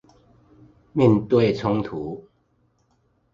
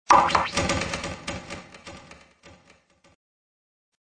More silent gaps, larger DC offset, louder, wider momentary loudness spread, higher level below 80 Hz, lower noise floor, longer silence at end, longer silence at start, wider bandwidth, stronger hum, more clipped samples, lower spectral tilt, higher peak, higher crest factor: neither; neither; first, -21 LUFS vs -24 LUFS; second, 15 LU vs 25 LU; second, -54 dBFS vs -48 dBFS; first, -66 dBFS vs -58 dBFS; second, 1.15 s vs 1.65 s; first, 0.95 s vs 0.1 s; second, 7.6 kHz vs 10.5 kHz; neither; neither; first, -8.5 dB/octave vs -3 dB/octave; about the same, -2 dBFS vs -2 dBFS; about the same, 22 dB vs 24 dB